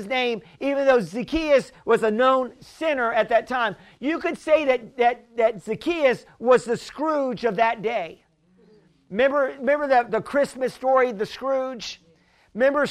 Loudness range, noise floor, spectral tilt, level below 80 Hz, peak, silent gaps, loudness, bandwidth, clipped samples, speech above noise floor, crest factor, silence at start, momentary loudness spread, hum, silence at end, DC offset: 2 LU; -59 dBFS; -5 dB/octave; -54 dBFS; -4 dBFS; none; -23 LUFS; 12 kHz; under 0.1%; 37 dB; 18 dB; 0 s; 9 LU; none; 0 s; under 0.1%